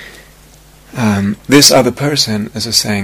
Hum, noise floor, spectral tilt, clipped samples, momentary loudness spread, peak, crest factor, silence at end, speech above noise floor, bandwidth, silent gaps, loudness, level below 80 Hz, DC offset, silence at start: none; -41 dBFS; -3.5 dB/octave; 0.5%; 12 LU; 0 dBFS; 14 dB; 0 s; 30 dB; over 20 kHz; none; -11 LUFS; -44 dBFS; under 0.1%; 0 s